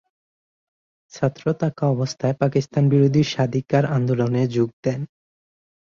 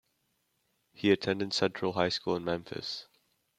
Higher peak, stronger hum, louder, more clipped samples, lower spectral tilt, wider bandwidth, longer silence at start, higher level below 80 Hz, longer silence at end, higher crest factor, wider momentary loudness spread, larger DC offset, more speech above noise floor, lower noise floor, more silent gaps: first, -4 dBFS vs -12 dBFS; neither; first, -21 LUFS vs -31 LUFS; neither; first, -7.5 dB/octave vs -5 dB/octave; second, 7.2 kHz vs 12.5 kHz; first, 1.15 s vs 1 s; first, -56 dBFS vs -70 dBFS; first, 0.8 s vs 0.55 s; about the same, 18 dB vs 22 dB; about the same, 8 LU vs 9 LU; neither; first, over 70 dB vs 46 dB; first, under -90 dBFS vs -77 dBFS; first, 4.73-4.83 s vs none